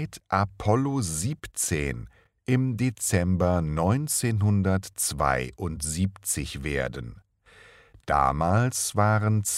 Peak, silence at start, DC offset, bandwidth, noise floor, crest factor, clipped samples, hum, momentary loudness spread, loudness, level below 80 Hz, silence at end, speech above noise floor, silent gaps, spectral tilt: -6 dBFS; 0 s; under 0.1%; 16 kHz; -54 dBFS; 18 dB; under 0.1%; none; 8 LU; -26 LUFS; -44 dBFS; 0 s; 29 dB; none; -5 dB/octave